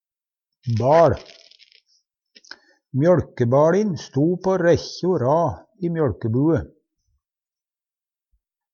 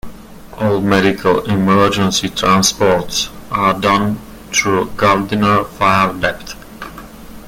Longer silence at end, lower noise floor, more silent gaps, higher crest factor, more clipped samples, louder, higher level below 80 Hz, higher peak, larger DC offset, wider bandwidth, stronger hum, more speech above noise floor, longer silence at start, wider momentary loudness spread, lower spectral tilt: first, 2.05 s vs 0 s; first, under -90 dBFS vs -34 dBFS; neither; about the same, 18 dB vs 16 dB; neither; second, -20 LUFS vs -14 LUFS; second, -50 dBFS vs -40 dBFS; second, -4 dBFS vs 0 dBFS; neither; second, 7 kHz vs 17 kHz; neither; first, over 71 dB vs 20 dB; first, 0.65 s vs 0.05 s; second, 11 LU vs 16 LU; first, -7.5 dB/octave vs -4 dB/octave